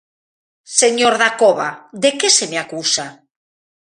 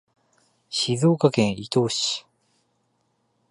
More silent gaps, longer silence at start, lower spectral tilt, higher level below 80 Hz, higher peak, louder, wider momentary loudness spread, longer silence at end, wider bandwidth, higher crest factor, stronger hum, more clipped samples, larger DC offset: neither; about the same, 0.7 s vs 0.7 s; second, -1 dB/octave vs -5 dB/octave; about the same, -66 dBFS vs -62 dBFS; first, 0 dBFS vs -4 dBFS; first, -15 LUFS vs -23 LUFS; about the same, 9 LU vs 8 LU; second, 0.7 s vs 1.3 s; about the same, 12.5 kHz vs 11.5 kHz; about the same, 18 dB vs 22 dB; neither; neither; neither